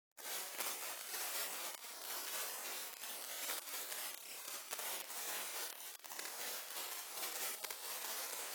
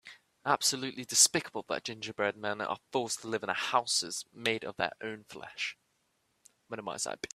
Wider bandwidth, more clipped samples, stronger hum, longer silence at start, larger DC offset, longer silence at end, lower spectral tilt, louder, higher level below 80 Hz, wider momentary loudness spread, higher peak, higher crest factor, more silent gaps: first, over 20 kHz vs 15.5 kHz; neither; neither; about the same, 0.15 s vs 0.05 s; neither; about the same, 0 s vs 0.1 s; second, 2 dB/octave vs -1 dB/octave; second, -43 LUFS vs -31 LUFS; second, under -90 dBFS vs -76 dBFS; second, 5 LU vs 15 LU; second, -22 dBFS vs -8 dBFS; about the same, 24 dB vs 26 dB; neither